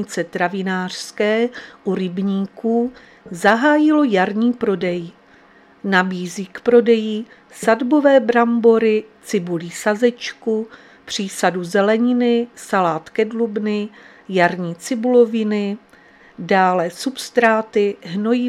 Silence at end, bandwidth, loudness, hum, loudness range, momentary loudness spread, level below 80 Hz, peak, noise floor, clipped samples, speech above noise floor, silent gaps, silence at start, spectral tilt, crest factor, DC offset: 0 s; 14 kHz; -18 LUFS; none; 4 LU; 12 LU; -66 dBFS; 0 dBFS; -49 dBFS; under 0.1%; 31 dB; none; 0 s; -5.5 dB/octave; 18 dB; under 0.1%